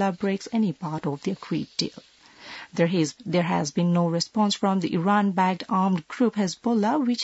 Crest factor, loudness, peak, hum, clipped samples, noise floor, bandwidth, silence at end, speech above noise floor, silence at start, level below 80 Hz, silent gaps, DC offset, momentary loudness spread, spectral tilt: 16 dB; -25 LUFS; -8 dBFS; none; under 0.1%; -45 dBFS; 8 kHz; 0 s; 20 dB; 0 s; -68 dBFS; none; under 0.1%; 7 LU; -5.5 dB/octave